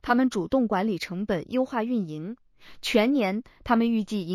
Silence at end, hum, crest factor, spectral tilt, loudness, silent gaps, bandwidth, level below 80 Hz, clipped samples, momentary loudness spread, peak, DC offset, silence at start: 0 s; none; 18 dB; -6 dB/octave; -26 LUFS; none; 14.5 kHz; -54 dBFS; under 0.1%; 11 LU; -8 dBFS; under 0.1%; 0.05 s